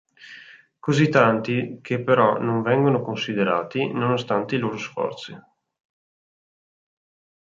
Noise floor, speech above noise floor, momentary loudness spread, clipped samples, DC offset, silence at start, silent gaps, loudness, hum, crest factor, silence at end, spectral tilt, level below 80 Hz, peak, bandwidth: -47 dBFS; 26 dB; 11 LU; under 0.1%; under 0.1%; 0.2 s; none; -22 LUFS; none; 22 dB; 2.1 s; -6.5 dB/octave; -66 dBFS; -2 dBFS; 7.8 kHz